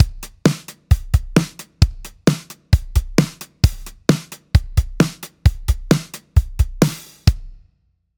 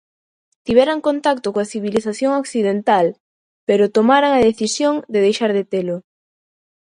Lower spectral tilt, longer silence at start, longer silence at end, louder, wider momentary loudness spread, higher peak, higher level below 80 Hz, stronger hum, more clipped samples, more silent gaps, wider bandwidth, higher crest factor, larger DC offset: first, -6 dB/octave vs -4.5 dB/octave; second, 0 s vs 0.65 s; second, 0.65 s vs 0.9 s; second, -20 LUFS vs -17 LUFS; second, 5 LU vs 9 LU; about the same, 0 dBFS vs 0 dBFS; first, -24 dBFS vs -54 dBFS; neither; neither; second, none vs 3.20-3.67 s; first, over 20 kHz vs 11 kHz; about the same, 18 dB vs 18 dB; neither